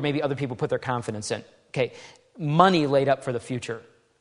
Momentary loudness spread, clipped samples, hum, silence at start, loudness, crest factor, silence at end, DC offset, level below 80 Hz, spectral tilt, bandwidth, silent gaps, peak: 15 LU; under 0.1%; none; 0 s; -25 LUFS; 24 dB; 0.4 s; under 0.1%; -64 dBFS; -6 dB/octave; 11 kHz; none; -2 dBFS